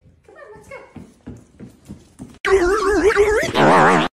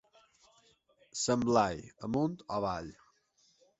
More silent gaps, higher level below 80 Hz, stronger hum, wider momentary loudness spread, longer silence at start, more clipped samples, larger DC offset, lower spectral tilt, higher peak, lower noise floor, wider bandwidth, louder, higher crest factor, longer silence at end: first, 2.40-2.44 s vs none; first, -38 dBFS vs -62 dBFS; neither; first, 26 LU vs 14 LU; second, 0.5 s vs 1.15 s; neither; neither; about the same, -5 dB/octave vs -5 dB/octave; first, -2 dBFS vs -14 dBFS; second, -44 dBFS vs -71 dBFS; first, 14 kHz vs 8.4 kHz; first, -15 LUFS vs -33 LUFS; about the same, 18 dB vs 22 dB; second, 0.05 s vs 0.85 s